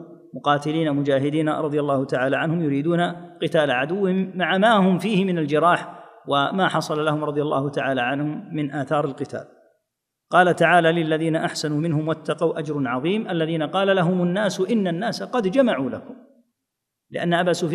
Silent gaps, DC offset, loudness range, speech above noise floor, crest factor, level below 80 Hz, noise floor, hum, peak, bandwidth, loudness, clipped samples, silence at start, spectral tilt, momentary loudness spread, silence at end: none; under 0.1%; 3 LU; 60 dB; 20 dB; -70 dBFS; -81 dBFS; none; -2 dBFS; 13 kHz; -21 LUFS; under 0.1%; 0 s; -6 dB/octave; 9 LU; 0 s